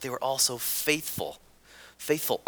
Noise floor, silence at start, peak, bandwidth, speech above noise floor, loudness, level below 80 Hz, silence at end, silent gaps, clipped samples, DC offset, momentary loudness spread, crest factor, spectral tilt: -53 dBFS; 0 s; -8 dBFS; over 20 kHz; 24 dB; -27 LUFS; -64 dBFS; 0.1 s; none; under 0.1%; under 0.1%; 12 LU; 22 dB; -2 dB/octave